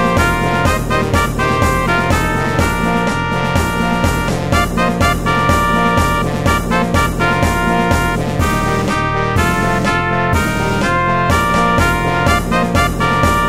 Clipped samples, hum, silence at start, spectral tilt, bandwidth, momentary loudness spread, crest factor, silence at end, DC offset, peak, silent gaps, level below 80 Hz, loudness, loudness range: under 0.1%; none; 0 s; -5.5 dB/octave; 16 kHz; 3 LU; 14 dB; 0 s; 1%; 0 dBFS; none; -24 dBFS; -14 LUFS; 1 LU